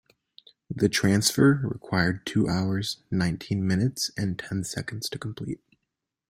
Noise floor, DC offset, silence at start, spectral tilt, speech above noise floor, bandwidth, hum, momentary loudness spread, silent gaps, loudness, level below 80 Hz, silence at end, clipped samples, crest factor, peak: -83 dBFS; under 0.1%; 0.7 s; -5 dB/octave; 58 dB; 16 kHz; none; 13 LU; none; -26 LUFS; -56 dBFS; 0.75 s; under 0.1%; 20 dB; -6 dBFS